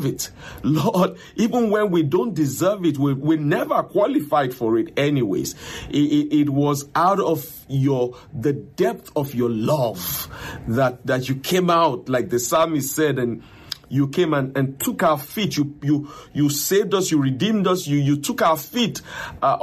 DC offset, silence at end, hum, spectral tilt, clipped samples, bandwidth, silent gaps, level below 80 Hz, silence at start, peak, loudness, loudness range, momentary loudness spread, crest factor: under 0.1%; 0 s; none; -5.5 dB/octave; under 0.1%; 15.5 kHz; none; -52 dBFS; 0 s; -6 dBFS; -21 LUFS; 2 LU; 7 LU; 16 dB